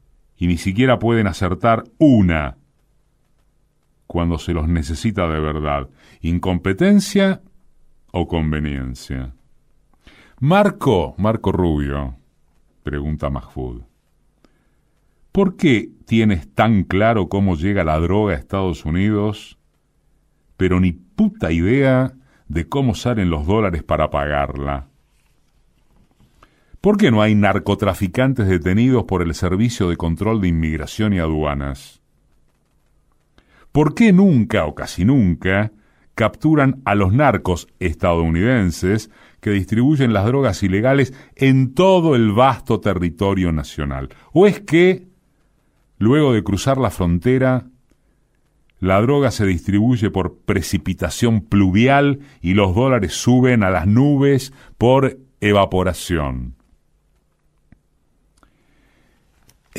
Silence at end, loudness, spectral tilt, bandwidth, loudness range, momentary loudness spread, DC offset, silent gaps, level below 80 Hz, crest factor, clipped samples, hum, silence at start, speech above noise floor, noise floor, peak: 0 s; -17 LUFS; -7 dB/octave; 15.5 kHz; 7 LU; 11 LU; under 0.1%; none; -38 dBFS; 16 dB; under 0.1%; none; 0.4 s; 44 dB; -61 dBFS; -2 dBFS